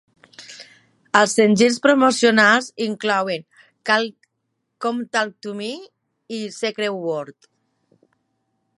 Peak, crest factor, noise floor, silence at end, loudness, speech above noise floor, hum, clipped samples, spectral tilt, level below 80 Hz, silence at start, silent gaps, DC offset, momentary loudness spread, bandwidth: 0 dBFS; 20 dB; -75 dBFS; 1.45 s; -19 LUFS; 56 dB; none; under 0.1%; -3.5 dB/octave; -70 dBFS; 0.4 s; none; under 0.1%; 18 LU; 11.5 kHz